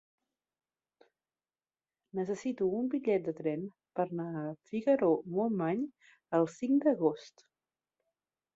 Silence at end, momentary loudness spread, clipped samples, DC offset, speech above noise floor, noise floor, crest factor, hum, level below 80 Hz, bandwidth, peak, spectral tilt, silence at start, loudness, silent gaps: 1.3 s; 11 LU; under 0.1%; under 0.1%; over 58 dB; under -90 dBFS; 20 dB; none; -78 dBFS; 7.8 kHz; -16 dBFS; -8 dB/octave; 2.15 s; -33 LUFS; none